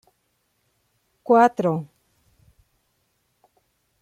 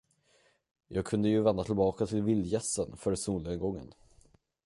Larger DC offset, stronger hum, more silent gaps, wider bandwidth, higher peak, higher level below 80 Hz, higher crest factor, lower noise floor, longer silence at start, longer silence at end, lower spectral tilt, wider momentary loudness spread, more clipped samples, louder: neither; neither; neither; about the same, 11.5 kHz vs 11.5 kHz; first, -4 dBFS vs -14 dBFS; second, -70 dBFS vs -54 dBFS; about the same, 22 dB vs 18 dB; about the same, -71 dBFS vs -69 dBFS; first, 1.3 s vs 0.9 s; first, 2.15 s vs 0.75 s; first, -7.5 dB/octave vs -6 dB/octave; first, 25 LU vs 9 LU; neither; first, -20 LUFS vs -31 LUFS